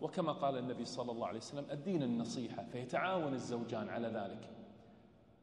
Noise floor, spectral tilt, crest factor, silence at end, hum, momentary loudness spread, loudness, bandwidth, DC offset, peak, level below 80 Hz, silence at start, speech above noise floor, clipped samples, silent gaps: -64 dBFS; -6 dB/octave; 18 dB; 0.15 s; none; 11 LU; -40 LUFS; 11 kHz; under 0.1%; -24 dBFS; -78 dBFS; 0 s; 24 dB; under 0.1%; none